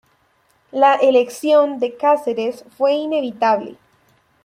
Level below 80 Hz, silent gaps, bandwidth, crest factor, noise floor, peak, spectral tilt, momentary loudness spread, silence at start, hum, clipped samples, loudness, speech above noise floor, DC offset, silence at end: -70 dBFS; none; 15.5 kHz; 16 dB; -60 dBFS; -2 dBFS; -4 dB/octave; 10 LU; 0.75 s; none; under 0.1%; -17 LUFS; 44 dB; under 0.1%; 0.7 s